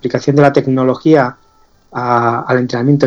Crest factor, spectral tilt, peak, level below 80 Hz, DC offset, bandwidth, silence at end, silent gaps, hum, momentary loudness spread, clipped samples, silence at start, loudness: 12 dB; -8 dB/octave; 0 dBFS; -52 dBFS; under 0.1%; 7.4 kHz; 0 s; none; none; 8 LU; 0.2%; 0.05 s; -13 LUFS